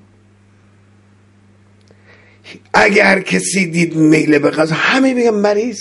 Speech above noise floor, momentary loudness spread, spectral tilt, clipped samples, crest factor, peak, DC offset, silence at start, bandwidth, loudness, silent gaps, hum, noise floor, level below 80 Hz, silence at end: 36 dB; 6 LU; -4.5 dB/octave; under 0.1%; 16 dB; 0 dBFS; under 0.1%; 2.45 s; 11.5 kHz; -12 LUFS; none; none; -48 dBFS; -54 dBFS; 0 s